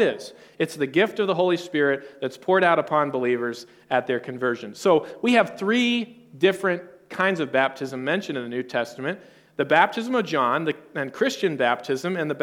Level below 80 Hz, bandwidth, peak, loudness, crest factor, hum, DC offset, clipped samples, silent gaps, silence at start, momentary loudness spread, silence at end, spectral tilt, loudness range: -74 dBFS; 16 kHz; -4 dBFS; -23 LUFS; 20 dB; none; under 0.1%; under 0.1%; none; 0 s; 11 LU; 0 s; -5 dB/octave; 2 LU